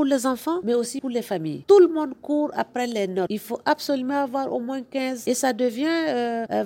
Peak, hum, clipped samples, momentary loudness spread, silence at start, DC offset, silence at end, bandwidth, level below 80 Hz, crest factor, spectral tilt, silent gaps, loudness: -6 dBFS; none; under 0.1%; 10 LU; 0 s; under 0.1%; 0 s; 17 kHz; -70 dBFS; 18 dB; -4.5 dB/octave; none; -23 LUFS